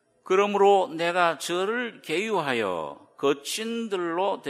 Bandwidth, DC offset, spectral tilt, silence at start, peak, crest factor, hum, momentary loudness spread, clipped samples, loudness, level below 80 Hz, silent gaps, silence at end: 15 kHz; under 0.1%; -3.5 dB/octave; 0.25 s; -6 dBFS; 18 dB; none; 9 LU; under 0.1%; -25 LUFS; -78 dBFS; none; 0 s